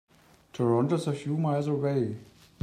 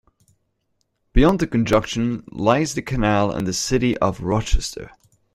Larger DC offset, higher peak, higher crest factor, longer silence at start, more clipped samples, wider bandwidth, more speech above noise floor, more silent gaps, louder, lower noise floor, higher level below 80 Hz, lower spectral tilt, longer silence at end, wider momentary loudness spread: neither; second, -12 dBFS vs -2 dBFS; about the same, 16 dB vs 18 dB; second, 0.55 s vs 1.15 s; neither; second, 12 kHz vs 15 kHz; second, 27 dB vs 51 dB; neither; second, -28 LUFS vs -21 LUFS; second, -54 dBFS vs -71 dBFS; second, -70 dBFS vs -30 dBFS; first, -8 dB/octave vs -5.5 dB/octave; about the same, 0.4 s vs 0.45 s; about the same, 9 LU vs 7 LU